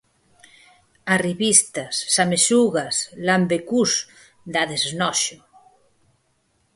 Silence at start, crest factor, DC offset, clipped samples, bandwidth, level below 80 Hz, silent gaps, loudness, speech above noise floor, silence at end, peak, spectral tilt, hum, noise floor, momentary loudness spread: 1.05 s; 22 dB; under 0.1%; under 0.1%; 12 kHz; -64 dBFS; none; -19 LUFS; 46 dB; 1.4 s; 0 dBFS; -2.5 dB/octave; none; -66 dBFS; 10 LU